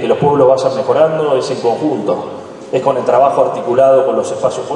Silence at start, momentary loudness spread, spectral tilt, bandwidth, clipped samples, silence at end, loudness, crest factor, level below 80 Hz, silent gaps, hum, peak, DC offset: 0 s; 8 LU; -6 dB/octave; 10.5 kHz; under 0.1%; 0 s; -13 LUFS; 12 dB; -58 dBFS; none; none; 0 dBFS; under 0.1%